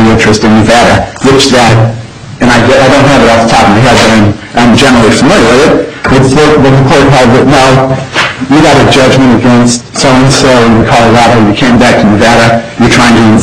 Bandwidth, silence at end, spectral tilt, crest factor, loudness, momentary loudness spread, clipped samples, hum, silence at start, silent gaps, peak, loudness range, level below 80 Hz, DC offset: 14.5 kHz; 0 s; -5 dB/octave; 4 dB; -4 LUFS; 5 LU; 2%; none; 0 s; none; 0 dBFS; 1 LU; -24 dBFS; under 0.1%